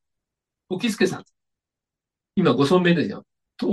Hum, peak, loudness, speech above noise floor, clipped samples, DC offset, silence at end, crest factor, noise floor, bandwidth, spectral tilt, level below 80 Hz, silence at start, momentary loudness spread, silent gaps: none; -4 dBFS; -21 LUFS; 67 dB; under 0.1%; under 0.1%; 0 s; 20 dB; -88 dBFS; 12.5 kHz; -6 dB/octave; -64 dBFS; 0.7 s; 15 LU; none